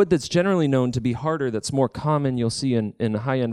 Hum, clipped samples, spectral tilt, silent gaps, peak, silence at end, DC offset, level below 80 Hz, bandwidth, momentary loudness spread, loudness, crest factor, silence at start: none; under 0.1%; -6.5 dB/octave; none; -6 dBFS; 0 s; under 0.1%; -52 dBFS; 12 kHz; 5 LU; -23 LUFS; 16 dB; 0 s